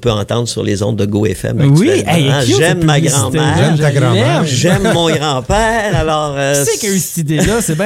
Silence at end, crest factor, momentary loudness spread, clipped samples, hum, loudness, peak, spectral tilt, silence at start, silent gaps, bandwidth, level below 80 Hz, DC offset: 0 s; 12 dB; 5 LU; under 0.1%; none; -12 LUFS; 0 dBFS; -5 dB/octave; 0 s; none; 16.5 kHz; -32 dBFS; under 0.1%